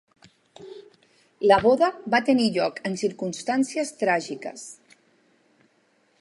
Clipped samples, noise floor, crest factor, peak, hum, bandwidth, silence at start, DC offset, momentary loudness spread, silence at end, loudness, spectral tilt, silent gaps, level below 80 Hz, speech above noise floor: under 0.1%; -65 dBFS; 22 dB; -4 dBFS; none; 11.5 kHz; 0.6 s; under 0.1%; 22 LU; 1.5 s; -23 LUFS; -4.5 dB/octave; none; -62 dBFS; 42 dB